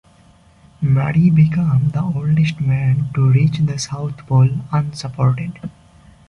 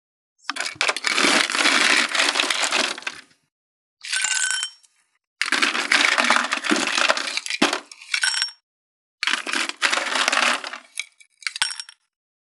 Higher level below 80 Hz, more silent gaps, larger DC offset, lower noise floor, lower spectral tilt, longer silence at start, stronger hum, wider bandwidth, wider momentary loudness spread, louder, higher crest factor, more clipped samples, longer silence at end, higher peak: first, -46 dBFS vs -86 dBFS; second, none vs 3.52-3.97 s, 5.27-5.36 s, 8.63-9.18 s; neither; second, -49 dBFS vs -61 dBFS; first, -7.5 dB/octave vs 0.5 dB/octave; first, 0.8 s vs 0.5 s; neither; second, 10 kHz vs 13.5 kHz; second, 10 LU vs 14 LU; first, -17 LUFS vs -20 LUFS; second, 14 dB vs 22 dB; neither; about the same, 0.6 s vs 0.65 s; second, -4 dBFS vs 0 dBFS